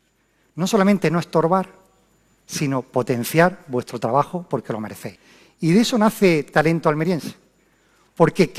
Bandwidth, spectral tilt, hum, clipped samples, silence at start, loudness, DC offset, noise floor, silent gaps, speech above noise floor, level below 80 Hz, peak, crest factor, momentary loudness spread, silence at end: 15 kHz; -6 dB/octave; none; under 0.1%; 0.55 s; -20 LUFS; under 0.1%; -63 dBFS; none; 44 dB; -56 dBFS; -2 dBFS; 18 dB; 13 LU; 0 s